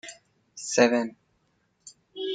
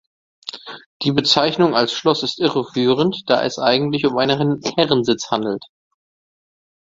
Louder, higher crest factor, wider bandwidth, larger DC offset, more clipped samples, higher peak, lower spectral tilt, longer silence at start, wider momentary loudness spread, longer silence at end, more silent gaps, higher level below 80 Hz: second, -25 LUFS vs -18 LUFS; about the same, 22 dB vs 18 dB; first, 9.4 kHz vs 7.8 kHz; neither; neither; second, -6 dBFS vs 0 dBFS; second, -3 dB/octave vs -5 dB/octave; second, 0.05 s vs 0.45 s; first, 23 LU vs 15 LU; second, 0 s vs 1.2 s; second, none vs 0.86-1.00 s; second, -74 dBFS vs -58 dBFS